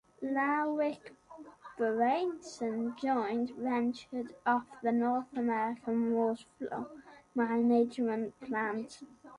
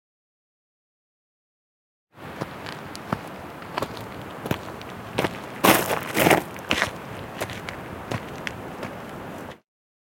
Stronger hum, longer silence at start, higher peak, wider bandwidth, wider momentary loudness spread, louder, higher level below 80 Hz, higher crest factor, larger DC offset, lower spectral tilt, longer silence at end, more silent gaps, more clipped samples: neither; second, 0.2 s vs 2.15 s; second, -16 dBFS vs 0 dBFS; second, 10.5 kHz vs 17 kHz; second, 13 LU vs 18 LU; second, -33 LUFS vs -27 LUFS; second, -74 dBFS vs -54 dBFS; second, 16 dB vs 28 dB; neither; first, -6 dB/octave vs -4 dB/octave; second, 0 s vs 0.45 s; neither; neither